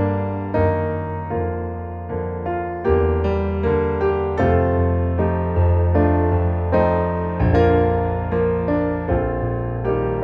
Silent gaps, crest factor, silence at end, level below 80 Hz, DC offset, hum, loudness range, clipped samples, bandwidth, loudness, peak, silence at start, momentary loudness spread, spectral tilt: none; 16 dB; 0 s; -30 dBFS; under 0.1%; none; 4 LU; under 0.1%; 5.2 kHz; -20 LUFS; -4 dBFS; 0 s; 8 LU; -10.5 dB/octave